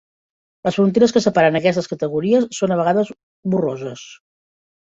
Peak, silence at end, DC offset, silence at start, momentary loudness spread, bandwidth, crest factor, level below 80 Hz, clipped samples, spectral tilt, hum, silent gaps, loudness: -2 dBFS; 0.75 s; under 0.1%; 0.65 s; 13 LU; 8 kHz; 18 dB; -60 dBFS; under 0.1%; -6 dB/octave; none; 3.23-3.43 s; -18 LUFS